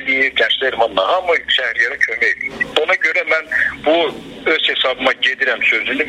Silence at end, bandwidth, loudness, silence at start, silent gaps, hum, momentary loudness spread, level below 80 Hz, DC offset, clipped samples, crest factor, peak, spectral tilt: 0 s; 13.5 kHz; -15 LUFS; 0 s; none; none; 3 LU; -52 dBFS; under 0.1%; under 0.1%; 16 dB; 0 dBFS; -2.5 dB/octave